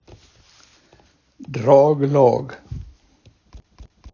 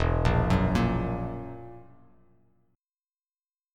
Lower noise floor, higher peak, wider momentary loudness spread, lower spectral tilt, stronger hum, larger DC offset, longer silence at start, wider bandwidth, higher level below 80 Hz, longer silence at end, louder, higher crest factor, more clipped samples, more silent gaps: second, -56 dBFS vs under -90 dBFS; first, 0 dBFS vs -10 dBFS; first, 23 LU vs 19 LU; about the same, -8.5 dB/octave vs -7.5 dB/octave; neither; neither; first, 1.4 s vs 0 s; second, 7 kHz vs 11 kHz; second, -46 dBFS vs -36 dBFS; second, 0.3 s vs 1.9 s; first, -16 LUFS vs -27 LUFS; about the same, 20 dB vs 18 dB; neither; neither